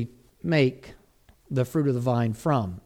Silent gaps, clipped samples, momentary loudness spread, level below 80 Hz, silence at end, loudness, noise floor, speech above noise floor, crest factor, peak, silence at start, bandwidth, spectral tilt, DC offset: none; under 0.1%; 13 LU; -56 dBFS; 0.05 s; -26 LUFS; -59 dBFS; 34 dB; 18 dB; -8 dBFS; 0 s; 15.5 kHz; -7.5 dB/octave; under 0.1%